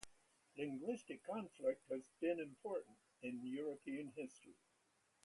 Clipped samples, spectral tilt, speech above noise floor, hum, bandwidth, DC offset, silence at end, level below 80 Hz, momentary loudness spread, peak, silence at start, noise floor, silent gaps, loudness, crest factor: under 0.1%; -5.5 dB/octave; 34 dB; none; 11.5 kHz; under 0.1%; 0.7 s; -86 dBFS; 11 LU; -26 dBFS; 0 s; -80 dBFS; none; -47 LUFS; 22 dB